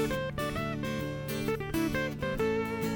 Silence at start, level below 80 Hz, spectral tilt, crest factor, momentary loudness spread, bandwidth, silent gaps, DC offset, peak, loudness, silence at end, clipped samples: 0 s; -48 dBFS; -5.5 dB/octave; 12 dB; 4 LU; over 20 kHz; none; under 0.1%; -20 dBFS; -32 LUFS; 0 s; under 0.1%